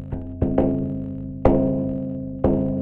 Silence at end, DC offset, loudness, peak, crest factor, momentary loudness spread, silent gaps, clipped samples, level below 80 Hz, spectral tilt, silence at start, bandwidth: 0 s; under 0.1%; -23 LUFS; 0 dBFS; 22 dB; 10 LU; none; under 0.1%; -34 dBFS; -12 dB/octave; 0 s; 3.7 kHz